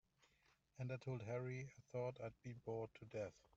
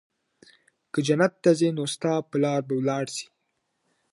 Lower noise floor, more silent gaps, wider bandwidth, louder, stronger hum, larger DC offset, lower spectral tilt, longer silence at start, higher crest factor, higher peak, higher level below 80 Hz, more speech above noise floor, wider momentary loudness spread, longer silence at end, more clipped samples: about the same, -79 dBFS vs -76 dBFS; neither; second, 7.8 kHz vs 11.5 kHz; second, -50 LUFS vs -25 LUFS; neither; neither; first, -7.5 dB/octave vs -5.5 dB/octave; second, 0.75 s vs 0.95 s; about the same, 16 dB vs 20 dB; second, -34 dBFS vs -6 dBFS; about the same, -78 dBFS vs -76 dBFS; second, 30 dB vs 52 dB; second, 6 LU vs 11 LU; second, 0.2 s vs 0.9 s; neither